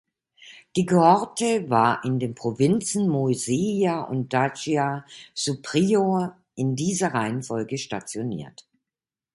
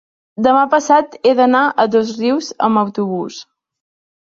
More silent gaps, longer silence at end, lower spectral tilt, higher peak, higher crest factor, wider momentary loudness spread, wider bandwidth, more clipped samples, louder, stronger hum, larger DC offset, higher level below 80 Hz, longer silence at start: neither; about the same, 0.85 s vs 0.9 s; about the same, -5.5 dB/octave vs -5 dB/octave; about the same, -4 dBFS vs -2 dBFS; first, 20 dB vs 14 dB; about the same, 10 LU vs 11 LU; first, 11.5 kHz vs 7.6 kHz; neither; second, -24 LUFS vs -15 LUFS; neither; neither; about the same, -64 dBFS vs -62 dBFS; about the same, 0.4 s vs 0.4 s